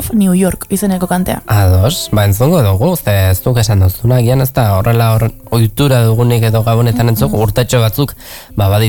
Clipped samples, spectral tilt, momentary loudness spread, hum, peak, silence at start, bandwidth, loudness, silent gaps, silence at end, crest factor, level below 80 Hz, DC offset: under 0.1%; -6 dB/octave; 5 LU; none; 0 dBFS; 0 s; 19.5 kHz; -12 LUFS; none; 0 s; 10 dB; -30 dBFS; under 0.1%